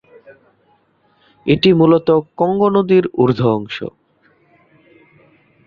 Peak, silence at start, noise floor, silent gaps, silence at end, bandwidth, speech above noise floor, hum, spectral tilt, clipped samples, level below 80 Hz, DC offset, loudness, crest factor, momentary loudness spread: -2 dBFS; 1.45 s; -58 dBFS; none; 1.8 s; 6.8 kHz; 44 dB; none; -8.5 dB/octave; under 0.1%; -52 dBFS; under 0.1%; -15 LUFS; 16 dB; 15 LU